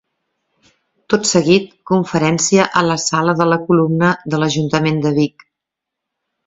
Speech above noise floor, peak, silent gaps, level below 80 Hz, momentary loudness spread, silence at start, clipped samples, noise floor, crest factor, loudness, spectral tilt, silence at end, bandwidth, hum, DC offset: 67 dB; 0 dBFS; none; -54 dBFS; 5 LU; 1.1 s; under 0.1%; -81 dBFS; 16 dB; -15 LUFS; -4.5 dB/octave; 1.2 s; 8 kHz; none; under 0.1%